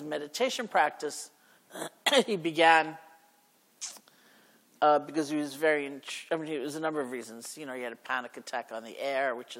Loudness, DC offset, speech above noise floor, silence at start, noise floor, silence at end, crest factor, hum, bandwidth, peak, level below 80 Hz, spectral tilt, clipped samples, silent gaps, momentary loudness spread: -29 LUFS; under 0.1%; 36 dB; 0 s; -66 dBFS; 0 s; 22 dB; none; 16.5 kHz; -8 dBFS; under -90 dBFS; -3 dB/octave; under 0.1%; none; 16 LU